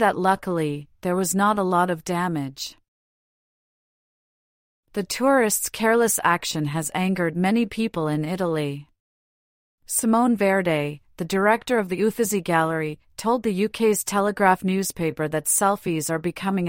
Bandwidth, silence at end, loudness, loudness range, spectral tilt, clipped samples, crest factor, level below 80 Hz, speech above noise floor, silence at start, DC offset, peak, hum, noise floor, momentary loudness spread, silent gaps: 16.5 kHz; 0 s; -22 LUFS; 5 LU; -4.5 dB/octave; under 0.1%; 18 dB; -58 dBFS; over 68 dB; 0 s; under 0.1%; -4 dBFS; none; under -90 dBFS; 9 LU; 2.88-4.83 s, 9.00-9.78 s